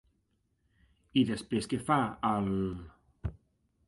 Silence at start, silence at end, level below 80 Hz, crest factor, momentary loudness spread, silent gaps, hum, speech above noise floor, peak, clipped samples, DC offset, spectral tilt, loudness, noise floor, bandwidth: 1.15 s; 0.55 s; -52 dBFS; 20 dB; 14 LU; none; none; 45 dB; -14 dBFS; under 0.1%; under 0.1%; -6 dB/octave; -31 LUFS; -76 dBFS; 11.5 kHz